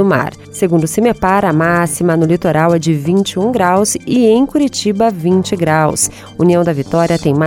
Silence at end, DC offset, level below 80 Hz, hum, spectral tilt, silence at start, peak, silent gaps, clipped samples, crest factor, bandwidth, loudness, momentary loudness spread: 0 s; under 0.1%; -42 dBFS; none; -5.5 dB/octave; 0 s; 0 dBFS; none; under 0.1%; 12 dB; 17.5 kHz; -13 LUFS; 3 LU